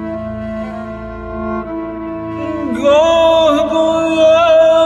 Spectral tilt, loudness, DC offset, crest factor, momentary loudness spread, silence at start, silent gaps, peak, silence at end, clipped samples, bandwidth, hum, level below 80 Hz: -5 dB/octave; -13 LUFS; under 0.1%; 12 dB; 15 LU; 0 s; none; -2 dBFS; 0 s; under 0.1%; 8.8 kHz; none; -38 dBFS